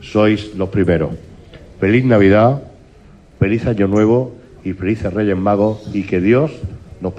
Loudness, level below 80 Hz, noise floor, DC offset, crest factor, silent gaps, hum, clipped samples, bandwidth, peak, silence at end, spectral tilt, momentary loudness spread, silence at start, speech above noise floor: -15 LUFS; -42 dBFS; -43 dBFS; under 0.1%; 14 dB; none; none; under 0.1%; 9.4 kHz; -2 dBFS; 0 s; -8.5 dB/octave; 16 LU; 0 s; 29 dB